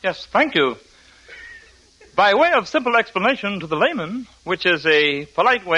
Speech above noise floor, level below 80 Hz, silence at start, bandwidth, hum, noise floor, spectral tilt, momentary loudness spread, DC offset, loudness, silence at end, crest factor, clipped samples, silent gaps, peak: 31 dB; -56 dBFS; 0.05 s; 10.5 kHz; none; -50 dBFS; -4.5 dB/octave; 14 LU; under 0.1%; -18 LUFS; 0 s; 18 dB; under 0.1%; none; -2 dBFS